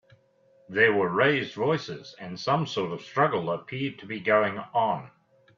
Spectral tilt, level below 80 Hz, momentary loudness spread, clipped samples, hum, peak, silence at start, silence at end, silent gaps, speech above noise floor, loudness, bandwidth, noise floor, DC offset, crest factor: -6 dB/octave; -70 dBFS; 11 LU; under 0.1%; none; -6 dBFS; 0.7 s; 0.5 s; none; 36 dB; -26 LUFS; 7.4 kHz; -62 dBFS; under 0.1%; 20 dB